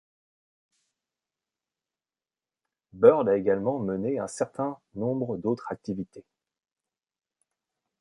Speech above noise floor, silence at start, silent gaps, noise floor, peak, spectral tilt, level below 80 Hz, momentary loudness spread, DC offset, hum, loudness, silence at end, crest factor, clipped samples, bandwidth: over 64 dB; 2.95 s; none; under -90 dBFS; -4 dBFS; -7.5 dB/octave; -66 dBFS; 14 LU; under 0.1%; none; -27 LUFS; 1.8 s; 26 dB; under 0.1%; 11.5 kHz